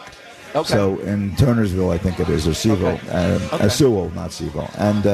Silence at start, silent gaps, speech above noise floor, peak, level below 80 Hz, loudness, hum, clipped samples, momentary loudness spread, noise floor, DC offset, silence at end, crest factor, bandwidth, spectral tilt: 0 s; none; 21 dB; -4 dBFS; -36 dBFS; -19 LUFS; none; under 0.1%; 10 LU; -39 dBFS; under 0.1%; 0 s; 14 dB; 14 kHz; -6 dB/octave